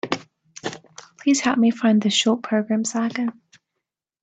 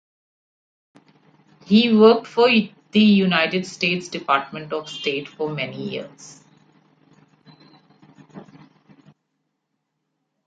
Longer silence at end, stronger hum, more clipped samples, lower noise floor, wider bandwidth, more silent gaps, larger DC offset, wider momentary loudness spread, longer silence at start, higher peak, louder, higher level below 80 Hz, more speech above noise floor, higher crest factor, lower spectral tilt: second, 0.9 s vs 2.05 s; neither; neither; first, -82 dBFS vs -76 dBFS; first, 9.2 kHz vs 7.8 kHz; neither; neither; about the same, 15 LU vs 15 LU; second, 0.05 s vs 1.7 s; about the same, -4 dBFS vs -2 dBFS; about the same, -21 LUFS vs -19 LUFS; about the same, -68 dBFS vs -68 dBFS; first, 62 dB vs 58 dB; about the same, 18 dB vs 20 dB; second, -4 dB/octave vs -6 dB/octave